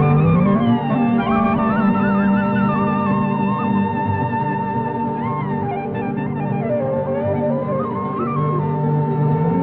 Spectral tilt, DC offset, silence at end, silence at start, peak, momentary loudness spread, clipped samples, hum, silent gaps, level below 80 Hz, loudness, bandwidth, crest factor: -11.5 dB/octave; under 0.1%; 0 s; 0 s; -6 dBFS; 6 LU; under 0.1%; none; none; -44 dBFS; -19 LUFS; 4.2 kHz; 12 dB